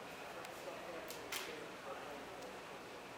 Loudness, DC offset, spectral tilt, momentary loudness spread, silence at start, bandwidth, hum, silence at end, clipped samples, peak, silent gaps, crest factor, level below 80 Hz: -48 LUFS; under 0.1%; -2.5 dB/octave; 6 LU; 0 s; 17 kHz; none; 0 s; under 0.1%; -26 dBFS; none; 24 dB; -76 dBFS